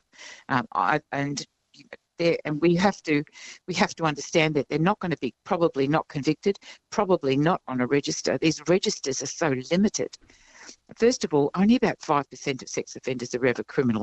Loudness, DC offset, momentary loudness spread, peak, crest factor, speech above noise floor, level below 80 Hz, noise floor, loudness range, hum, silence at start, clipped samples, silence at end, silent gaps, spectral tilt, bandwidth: -25 LUFS; under 0.1%; 9 LU; -6 dBFS; 20 dB; 24 dB; -60 dBFS; -49 dBFS; 1 LU; none; 0.2 s; under 0.1%; 0 s; none; -5 dB/octave; 8.4 kHz